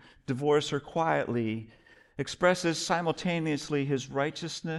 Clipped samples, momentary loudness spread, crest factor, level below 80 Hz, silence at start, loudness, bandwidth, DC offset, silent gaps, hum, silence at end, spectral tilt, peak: under 0.1%; 10 LU; 20 dB; -62 dBFS; 0.3 s; -30 LUFS; 12 kHz; under 0.1%; none; none; 0 s; -5 dB/octave; -10 dBFS